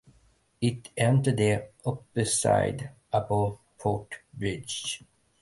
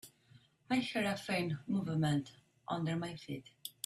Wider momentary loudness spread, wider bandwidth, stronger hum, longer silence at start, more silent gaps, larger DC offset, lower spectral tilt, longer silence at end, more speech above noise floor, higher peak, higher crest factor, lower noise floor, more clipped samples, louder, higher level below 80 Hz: second, 11 LU vs 15 LU; second, 11.5 kHz vs 14 kHz; neither; first, 0.6 s vs 0.05 s; neither; neither; about the same, -5 dB/octave vs -5.5 dB/octave; first, 0.45 s vs 0.15 s; first, 37 dB vs 29 dB; first, -10 dBFS vs -22 dBFS; about the same, 18 dB vs 16 dB; about the same, -64 dBFS vs -65 dBFS; neither; first, -28 LUFS vs -37 LUFS; first, -54 dBFS vs -72 dBFS